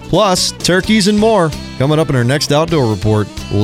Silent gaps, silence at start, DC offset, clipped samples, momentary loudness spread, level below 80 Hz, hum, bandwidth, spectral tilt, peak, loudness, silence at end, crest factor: none; 0 s; 0.1%; under 0.1%; 6 LU; -34 dBFS; none; 16 kHz; -5 dB/octave; -2 dBFS; -13 LUFS; 0 s; 12 dB